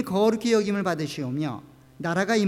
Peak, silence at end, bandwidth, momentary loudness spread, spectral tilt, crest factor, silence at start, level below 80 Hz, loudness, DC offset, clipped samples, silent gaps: -10 dBFS; 0 s; 16 kHz; 10 LU; -5.5 dB/octave; 14 dB; 0 s; -62 dBFS; -25 LUFS; under 0.1%; under 0.1%; none